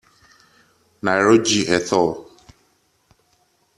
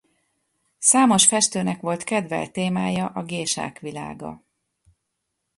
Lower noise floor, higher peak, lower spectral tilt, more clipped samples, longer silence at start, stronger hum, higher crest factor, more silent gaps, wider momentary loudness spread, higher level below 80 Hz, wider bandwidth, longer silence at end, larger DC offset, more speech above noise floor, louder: second, -63 dBFS vs -78 dBFS; about the same, -2 dBFS vs -2 dBFS; about the same, -3.5 dB/octave vs -3 dB/octave; neither; first, 1.05 s vs 0.8 s; neither; about the same, 20 dB vs 22 dB; neither; second, 10 LU vs 18 LU; about the same, -58 dBFS vs -62 dBFS; about the same, 12.5 kHz vs 11.5 kHz; first, 1.55 s vs 1.2 s; neither; second, 46 dB vs 56 dB; about the same, -18 LUFS vs -20 LUFS